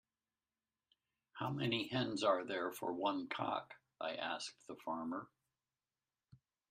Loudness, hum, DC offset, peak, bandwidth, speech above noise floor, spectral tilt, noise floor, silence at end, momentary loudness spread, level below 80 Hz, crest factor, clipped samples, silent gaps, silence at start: -41 LUFS; none; under 0.1%; -20 dBFS; 15 kHz; over 50 dB; -5 dB/octave; under -90 dBFS; 1.45 s; 12 LU; -80 dBFS; 22 dB; under 0.1%; none; 1.35 s